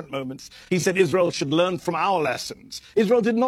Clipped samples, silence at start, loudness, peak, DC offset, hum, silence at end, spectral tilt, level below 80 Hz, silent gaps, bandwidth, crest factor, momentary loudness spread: under 0.1%; 0 s; -22 LUFS; -6 dBFS; under 0.1%; none; 0 s; -5 dB/octave; -62 dBFS; none; 13.5 kHz; 16 dB; 13 LU